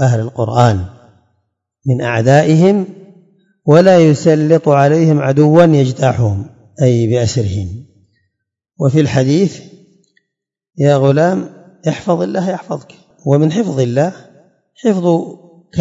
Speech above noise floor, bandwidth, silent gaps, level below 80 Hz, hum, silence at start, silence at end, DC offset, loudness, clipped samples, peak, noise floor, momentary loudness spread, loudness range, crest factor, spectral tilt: 64 dB; 7.8 kHz; none; -52 dBFS; none; 0 s; 0 s; under 0.1%; -13 LUFS; 0.2%; 0 dBFS; -75 dBFS; 15 LU; 6 LU; 14 dB; -7.5 dB/octave